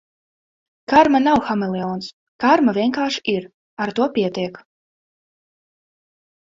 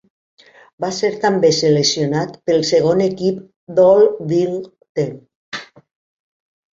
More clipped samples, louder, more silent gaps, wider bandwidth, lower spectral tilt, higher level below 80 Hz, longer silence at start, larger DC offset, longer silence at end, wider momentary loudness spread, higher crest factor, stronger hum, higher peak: neither; second, -19 LUFS vs -16 LUFS; first, 2.13-2.39 s, 3.54-3.77 s vs 3.56-3.67 s, 4.89-4.95 s, 5.35-5.52 s; about the same, 7.6 kHz vs 7.8 kHz; about the same, -5.5 dB/octave vs -5 dB/octave; about the same, -56 dBFS vs -60 dBFS; about the same, 0.9 s vs 0.8 s; neither; first, 1.95 s vs 1.1 s; about the same, 15 LU vs 16 LU; about the same, 20 dB vs 16 dB; neither; about the same, 0 dBFS vs -2 dBFS